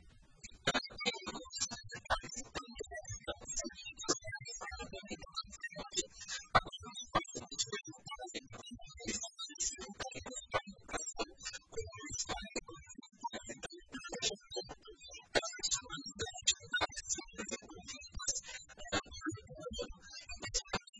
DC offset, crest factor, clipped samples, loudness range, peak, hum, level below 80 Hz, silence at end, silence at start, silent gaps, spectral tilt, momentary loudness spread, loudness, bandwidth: under 0.1%; 28 dB; under 0.1%; 5 LU; -14 dBFS; none; -58 dBFS; 0 s; 0 s; 20.89-20.93 s; -1.5 dB/octave; 12 LU; -40 LUFS; 10.5 kHz